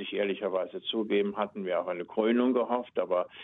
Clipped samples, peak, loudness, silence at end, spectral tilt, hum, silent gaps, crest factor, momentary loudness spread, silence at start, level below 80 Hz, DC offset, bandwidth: under 0.1%; -14 dBFS; -30 LUFS; 0 s; -8.5 dB/octave; none; none; 16 dB; 7 LU; 0 s; -78 dBFS; under 0.1%; 4 kHz